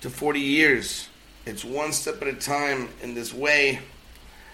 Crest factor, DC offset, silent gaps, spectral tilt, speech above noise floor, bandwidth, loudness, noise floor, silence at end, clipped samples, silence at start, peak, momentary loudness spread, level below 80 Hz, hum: 20 dB; under 0.1%; none; -2.5 dB/octave; 22 dB; 16.5 kHz; -24 LUFS; -47 dBFS; 0 s; under 0.1%; 0 s; -6 dBFS; 16 LU; -52 dBFS; none